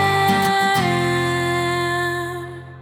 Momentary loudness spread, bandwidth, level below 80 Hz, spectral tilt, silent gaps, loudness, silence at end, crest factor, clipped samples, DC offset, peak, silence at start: 11 LU; 19 kHz; -50 dBFS; -4.5 dB/octave; none; -19 LUFS; 0 s; 14 dB; under 0.1%; under 0.1%; -6 dBFS; 0 s